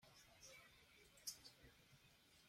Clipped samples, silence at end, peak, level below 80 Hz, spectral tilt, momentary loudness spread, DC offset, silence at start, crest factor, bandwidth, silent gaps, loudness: under 0.1%; 0 s; -36 dBFS; -82 dBFS; -0.5 dB/octave; 14 LU; under 0.1%; 0 s; 28 dB; 16.5 kHz; none; -60 LUFS